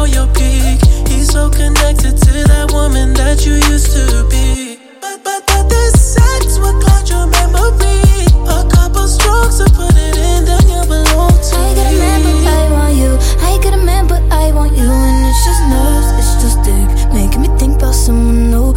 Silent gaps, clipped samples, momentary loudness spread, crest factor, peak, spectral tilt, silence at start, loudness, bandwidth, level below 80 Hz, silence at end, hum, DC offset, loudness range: none; under 0.1%; 3 LU; 8 dB; 0 dBFS; -5 dB/octave; 0 s; -11 LUFS; 16 kHz; -10 dBFS; 0 s; none; under 0.1%; 1 LU